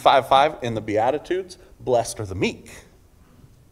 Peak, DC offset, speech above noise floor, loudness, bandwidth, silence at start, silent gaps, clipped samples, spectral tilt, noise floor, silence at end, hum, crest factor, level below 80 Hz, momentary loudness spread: -2 dBFS; under 0.1%; 31 dB; -22 LUFS; 15.5 kHz; 0 s; none; under 0.1%; -4.5 dB/octave; -52 dBFS; 0.9 s; none; 22 dB; -52 dBFS; 15 LU